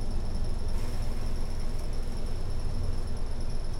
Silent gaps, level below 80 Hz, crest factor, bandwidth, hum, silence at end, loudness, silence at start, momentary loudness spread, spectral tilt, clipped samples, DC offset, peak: none; -28 dBFS; 10 dB; 11.5 kHz; none; 0 s; -36 LUFS; 0 s; 2 LU; -6 dB/octave; under 0.1%; under 0.1%; -18 dBFS